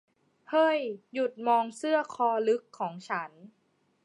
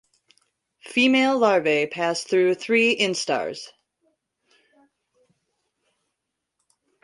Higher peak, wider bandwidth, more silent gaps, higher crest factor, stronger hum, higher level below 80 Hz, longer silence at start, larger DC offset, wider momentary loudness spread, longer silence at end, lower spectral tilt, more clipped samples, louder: second, -14 dBFS vs -6 dBFS; about the same, 11.5 kHz vs 11.5 kHz; neither; about the same, 16 dB vs 20 dB; neither; second, -88 dBFS vs -72 dBFS; second, 0.5 s vs 0.85 s; neither; about the same, 10 LU vs 9 LU; second, 0.55 s vs 3.35 s; about the same, -4.5 dB/octave vs -3.5 dB/octave; neither; second, -29 LUFS vs -21 LUFS